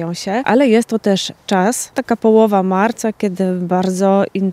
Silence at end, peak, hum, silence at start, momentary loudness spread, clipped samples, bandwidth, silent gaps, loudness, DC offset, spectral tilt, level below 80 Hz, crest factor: 0 s; 0 dBFS; none; 0 s; 7 LU; under 0.1%; 15.5 kHz; none; -15 LUFS; under 0.1%; -5.5 dB/octave; -60 dBFS; 14 dB